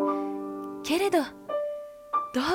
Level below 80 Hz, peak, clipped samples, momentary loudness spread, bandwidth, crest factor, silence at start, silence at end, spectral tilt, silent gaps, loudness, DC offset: -64 dBFS; -14 dBFS; under 0.1%; 10 LU; 17.5 kHz; 16 dB; 0 s; 0 s; -3.5 dB/octave; none; -29 LUFS; under 0.1%